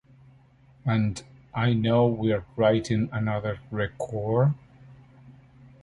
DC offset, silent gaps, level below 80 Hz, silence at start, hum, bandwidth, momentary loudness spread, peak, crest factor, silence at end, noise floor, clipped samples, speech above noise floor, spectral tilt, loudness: under 0.1%; none; -52 dBFS; 0.85 s; none; 11 kHz; 10 LU; -8 dBFS; 18 dB; 0.5 s; -56 dBFS; under 0.1%; 32 dB; -7.5 dB/octave; -26 LUFS